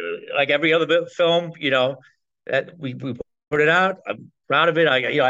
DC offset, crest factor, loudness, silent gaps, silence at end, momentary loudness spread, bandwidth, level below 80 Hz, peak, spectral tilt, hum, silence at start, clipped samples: under 0.1%; 16 dB; -20 LUFS; none; 0 s; 16 LU; 7.8 kHz; -64 dBFS; -6 dBFS; -5.5 dB/octave; none; 0 s; under 0.1%